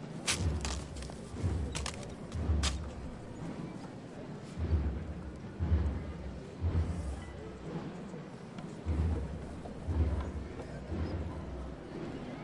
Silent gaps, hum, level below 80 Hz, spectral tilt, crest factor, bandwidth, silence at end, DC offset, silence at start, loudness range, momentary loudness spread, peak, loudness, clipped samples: none; none; -42 dBFS; -5.5 dB/octave; 20 dB; 11.5 kHz; 0 s; under 0.1%; 0 s; 2 LU; 12 LU; -16 dBFS; -38 LUFS; under 0.1%